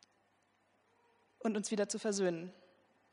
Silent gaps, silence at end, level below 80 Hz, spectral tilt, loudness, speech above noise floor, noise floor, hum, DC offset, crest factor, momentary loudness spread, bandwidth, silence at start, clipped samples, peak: none; 0.6 s; -88 dBFS; -4 dB/octave; -37 LUFS; 39 dB; -75 dBFS; none; under 0.1%; 18 dB; 9 LU; 10.5 kHz; 1.4 s; under 0.1%; -22 dBFS